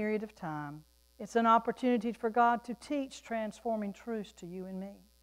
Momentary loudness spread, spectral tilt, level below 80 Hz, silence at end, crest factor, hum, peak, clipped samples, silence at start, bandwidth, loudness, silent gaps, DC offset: 17 LU; -6 dB/octave; -68 dBFS; 0.25 s; 20 dB; none; -14 dBFS; under 0.1%; 0 s; 15.5 kHz; -33 LUFS; none; under 0.1%